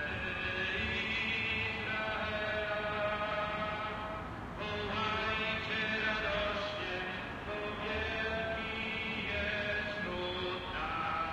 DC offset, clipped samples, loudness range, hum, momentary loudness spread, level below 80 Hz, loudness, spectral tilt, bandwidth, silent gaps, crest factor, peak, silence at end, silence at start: under 0.1%; under 0.1%; 2 LU; none; 6 LU; -52 dBFS; -35 LUFS; -5 dB/octave; 14 kHz; none; 14 dB; -22 dBFS; 0 s; 0 s